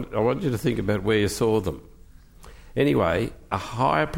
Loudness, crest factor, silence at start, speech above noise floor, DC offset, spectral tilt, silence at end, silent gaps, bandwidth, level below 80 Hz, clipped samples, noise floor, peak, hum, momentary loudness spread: -24 LUFS; 16 dB; 0 s; 25 dB; under 0.1%; -6 dB/octave; 0 s; none; 16.5 kHz; -44 dBFS; under 0.1%; -48 dBFS; -8 dBFS; none; 9 LU